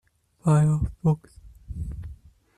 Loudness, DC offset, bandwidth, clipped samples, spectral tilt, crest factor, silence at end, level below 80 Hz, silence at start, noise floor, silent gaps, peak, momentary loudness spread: -24 LUFS; under 0.1%; 10.5 kHz; under 0.1%; -9 dB/octave; 16 dB; 0.4 s; -40 dBFS; 0.45 s; -46 dBFS; none; -10 dBFS; 20 LU